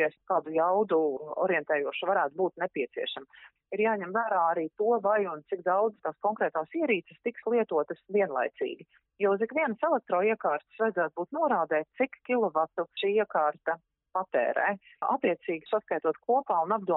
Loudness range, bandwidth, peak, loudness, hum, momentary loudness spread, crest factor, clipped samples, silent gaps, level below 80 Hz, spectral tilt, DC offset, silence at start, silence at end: 1 LU; 4 kHz; -14 dBFS; -29 LUFS; none; 7 LU; 16 dB; under 0.1%; none; -82 dBFS; -3 dB/octave; under 0.1%; 0 s; 0 s